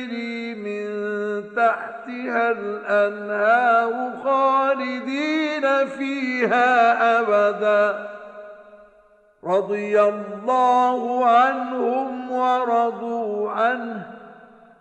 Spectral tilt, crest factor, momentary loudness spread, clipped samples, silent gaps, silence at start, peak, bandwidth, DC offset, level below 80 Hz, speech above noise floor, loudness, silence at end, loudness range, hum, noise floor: -5 dB/octave; 14 dB; 12 LU; under 0.1%; none; 0 s; -6 dBFS; 8.6 kHz; under 0.1%; -72 dBFS; 35 dB; -21 LUFS; 0.45 s; 4 LU; none; -55 dBFS